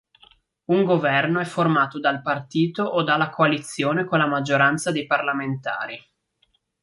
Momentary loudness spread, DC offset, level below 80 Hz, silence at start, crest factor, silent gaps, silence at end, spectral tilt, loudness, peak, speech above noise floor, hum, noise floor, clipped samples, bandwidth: 8 LU; under 0.1%; -68 dBFS; 0.7 s; 18 dB; none; 0.85 s; -5.5 dB/octave; -21 LUFS; -4 dBFS; 46 dB; none; -68 dBFS; under 0.1%; 11.5 kHz